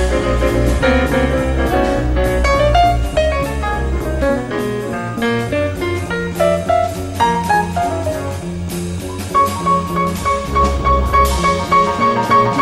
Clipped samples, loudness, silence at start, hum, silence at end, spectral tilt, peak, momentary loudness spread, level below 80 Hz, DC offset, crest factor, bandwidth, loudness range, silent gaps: under 0.1%; -16 LUFS; 0 s; none; 0 s; -5.5 dB/octave; 0 dBFS; 8 LU; -22 dBFS; under 0.1%; 14 dB; 15.5 kHz; 3 LU; none